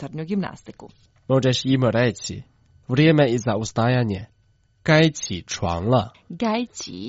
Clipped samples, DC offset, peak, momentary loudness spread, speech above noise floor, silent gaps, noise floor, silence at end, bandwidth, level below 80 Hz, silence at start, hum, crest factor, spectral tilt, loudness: under 0.1%; under 0.1%; -2 dBFS; 15 LU; 40 dB; none; -61 dBFS; 0 s; 8 kHz; -52 dBFS; 0 s; none; 20 dB; -5.5 dB/octave; -21 LUFS